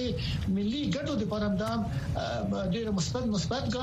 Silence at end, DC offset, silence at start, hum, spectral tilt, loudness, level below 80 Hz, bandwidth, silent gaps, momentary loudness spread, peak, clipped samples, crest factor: 0 s; under 0.1%; 0 s; none; -6 dB/octave; -31 LUFS; -44 dBFS; 13.5 kHz; none; 2 LU; -18 dBFS; under 0.1%; 12 dB